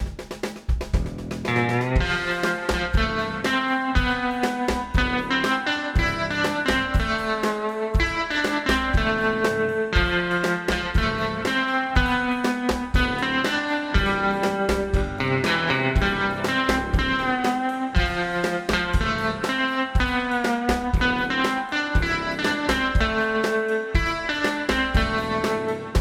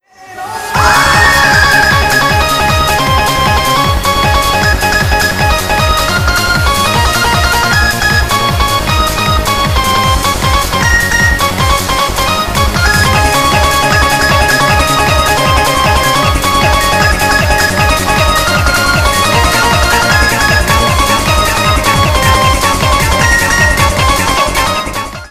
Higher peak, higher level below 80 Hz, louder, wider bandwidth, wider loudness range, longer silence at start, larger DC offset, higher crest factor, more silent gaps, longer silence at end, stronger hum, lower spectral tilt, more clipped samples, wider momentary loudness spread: second, -4 dBFS vs 0 dBFS; second, -30 dBFS vs -18 dBFS; second, -23 LUFS vs -9 LUFS; about the same, 15.5 kHz vs 16 kHz; about the same, 1 LU vs 2 LU; second, 0 s vs 0.2 s; second, under 0.1% vs 0.5%; first, 18 dB vs 10 dB; neither; about the same, 0 s vs 0.05 s; neither; first, -5 dB/octave vs -3.5 dB/octave; neither; about the same, 3 LU vs 3 LU